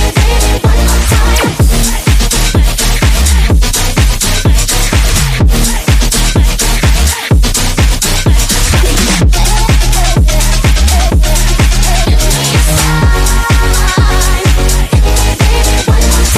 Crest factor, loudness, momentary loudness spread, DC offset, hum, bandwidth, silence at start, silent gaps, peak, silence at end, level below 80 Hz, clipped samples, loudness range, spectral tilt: 8 dB; -10 LUFS; 1 LU; under 0.1%; none; 16 kHz; 0 s; none; 0 dBFS; 0 s; -10 dBFS; 0.1%; 0 LU; -3.5 dB/octave